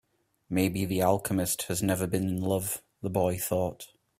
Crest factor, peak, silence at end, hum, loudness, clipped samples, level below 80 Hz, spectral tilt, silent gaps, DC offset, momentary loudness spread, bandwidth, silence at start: 18 dB; -10 dBFS; 0.35 s; none; -29 LUFS; under 0.1%; -58 dBFS; -5 dB/octave; none; under 0.1%; 7 LU; 16 kHz; 0.5 s